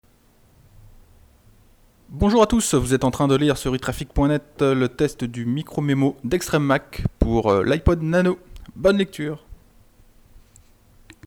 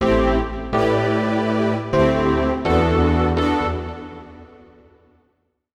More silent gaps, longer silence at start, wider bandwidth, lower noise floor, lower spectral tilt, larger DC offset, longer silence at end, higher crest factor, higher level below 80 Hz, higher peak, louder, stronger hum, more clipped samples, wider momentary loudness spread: neither; first, 2.1 s vs 0 s; first, 19 kHz vs 10.5 kHz; second, -56 dBFS vs -68 dBFS; second, -6 dB/octave vs -7.5 dB/octave; neither; second, 0.9 s vs 1.3 s; first, 20 dB vs 12 dB; second, -36 dBFS vs -30 dBFS; first, -2 dBFS vs -6 dBFS; about the same, -21 LUFS vs -19 LUFS; neither; neither; second, 8 LU vs 11 LU